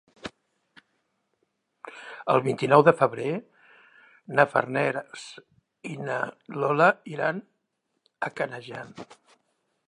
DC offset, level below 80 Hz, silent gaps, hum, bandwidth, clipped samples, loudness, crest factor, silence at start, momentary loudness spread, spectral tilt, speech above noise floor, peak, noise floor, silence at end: under 0.1%; -74 dBFS; none; none; 11 kHz; under 0.1%; -25 LUFS; 24 dB; 0.25 s; 22 LU; -6.5 dB/octave; 53 dB; -4 dBFS; -78 dBFS; 0.85 s